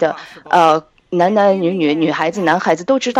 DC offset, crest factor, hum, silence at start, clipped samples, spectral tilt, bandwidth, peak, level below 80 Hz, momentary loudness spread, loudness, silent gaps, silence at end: under 0.1%; 14 dB; none; 0 s; under 0.1%; -5.5 dB/octave; 12 kHz; 0 dBFS; -62 dBFS; 7 LU; -15 LUFS; none; 0 s